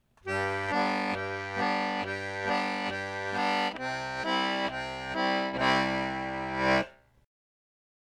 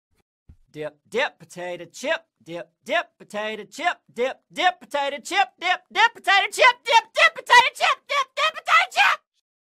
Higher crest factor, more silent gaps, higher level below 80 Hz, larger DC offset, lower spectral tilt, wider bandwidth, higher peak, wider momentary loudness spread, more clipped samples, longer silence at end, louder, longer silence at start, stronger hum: about the same, 18 dB vs 22 dB; neither; first, -58 dBFS vs -68 dBFS; neither; first, -4.5 dB/octave vs -0.5 dB/octave; second, 13.5 kHz vs 15.5 kHz; second, -14 dBFS vs -2 dBFS; second, 7 LU vs 18 LU; neither; first, 1.1 s vs 0.45 s; second, -30 LUFS vs -20 LUFS; second, 0.25 s vs 0.75 s; neither